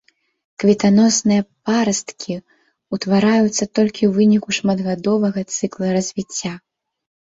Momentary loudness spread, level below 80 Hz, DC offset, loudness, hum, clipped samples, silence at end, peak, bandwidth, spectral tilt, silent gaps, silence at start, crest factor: 14 LU; -58 dBFS; under 0.1%; -18 LUFS; none; under 0.1%; 0.65 s; -2 dBFS; 8 kHz; -5 dB/octave; none; 0.6 s; 16 dB